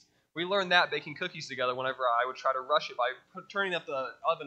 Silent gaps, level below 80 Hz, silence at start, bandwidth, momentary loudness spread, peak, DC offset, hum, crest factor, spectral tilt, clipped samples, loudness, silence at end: none; -82 dBFS; 0.35 s; 8.6 kHz; 12 LU; -8 dBFS; under 0.1%; none; 22 dB; -3.5 dB/octave; under 0.1%; -30 LUFS; 0 s